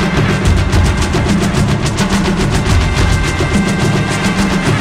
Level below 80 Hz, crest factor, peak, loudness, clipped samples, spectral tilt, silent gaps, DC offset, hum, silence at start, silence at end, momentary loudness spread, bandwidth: -20 dBFS; 12 dB; 0 dBFS; -13 LUFS; under 0.1%; -5.5 dB/octave; none; under 0.1%; none; 0 s; 0 s; 2 LU; 16 kHz